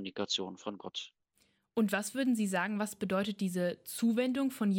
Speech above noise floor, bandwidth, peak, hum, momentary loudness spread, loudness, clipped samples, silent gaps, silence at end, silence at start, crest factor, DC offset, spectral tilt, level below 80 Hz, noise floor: 41 dB; 17 kHz; -18 dBFS; none; 11 LU; -34 LUFS; under 0.1%; none; 0 s; 0 s; 16 dB; under 0.1%; -4.5 dB/octave; -76 dBFS; -74 dBFS